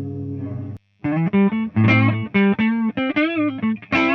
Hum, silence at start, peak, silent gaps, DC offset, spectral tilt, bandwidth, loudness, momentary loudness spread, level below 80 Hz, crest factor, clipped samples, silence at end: none; 0 s; -4 dBFS; none; under 0.1%; -8.5 dB/octave; 6.2 kHz; -19 LUFS; 13 LU; -54 dBFS; 16 dB; under 0.1%; 0 s